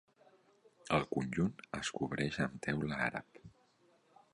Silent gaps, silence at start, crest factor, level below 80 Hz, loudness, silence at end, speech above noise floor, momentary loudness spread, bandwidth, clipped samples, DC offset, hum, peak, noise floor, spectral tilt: none; 0.85 s; 22 dB; -62 dBFS; -37 LUFS; 0.85 s; 34 dB; 6 LU; 11 kHz; under 0.1%; under 0.1%; none; -18 dBFS; -71 dBFS; -5.5 dB/octave